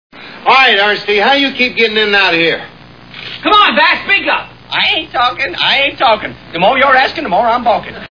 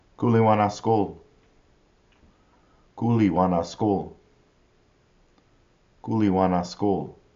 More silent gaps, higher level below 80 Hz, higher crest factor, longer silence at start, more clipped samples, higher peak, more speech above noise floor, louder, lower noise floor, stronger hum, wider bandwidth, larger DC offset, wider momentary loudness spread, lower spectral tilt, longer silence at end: neither; first, -46 dBFS vs -58 dBFS; second, 12 dB vs 18 dB; about the same, 0.15 s vs 0.2 s; first, 0.1% vs under 0.1%; first, 0 dBFS vs -8 dBFS; second, 22 dB vs 39 dB; first, -10 LUFS vs -23 LUFS; second, -34 dBFS vs -62 dBFS; neither; second, 5.4 kHz vs 7.4 kHz; first, 0.4% vs under 0.1%; about the same, 9 LU vs 9 LU; second, -4 dB/octave vs -7.5 dB/octave; second, 0.05 s vs 0.25 s